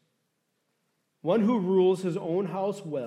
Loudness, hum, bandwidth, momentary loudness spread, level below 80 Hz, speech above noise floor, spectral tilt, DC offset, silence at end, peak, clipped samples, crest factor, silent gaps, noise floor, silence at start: -27 LUFS; none; 11 kHz; 8 LU; -84 dBFS; 51 dB; -8 dB/octave; under 0.1%; 0 s; -12 dBFS; under 0.1%; 16 dB; none; -77 dBFS; 1.25 s